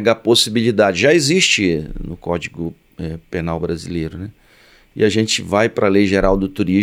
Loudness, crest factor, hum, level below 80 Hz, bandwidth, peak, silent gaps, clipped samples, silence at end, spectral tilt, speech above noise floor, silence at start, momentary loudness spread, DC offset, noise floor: -16 LUFS; 16 dB; none; -36 dBFS; 16 kHz; -2 dBFS; none; under 0.1%; 0 s; -4 dB/octave; 33 dB; 0 s; 16 LU; under 0.1%; -50 dBFS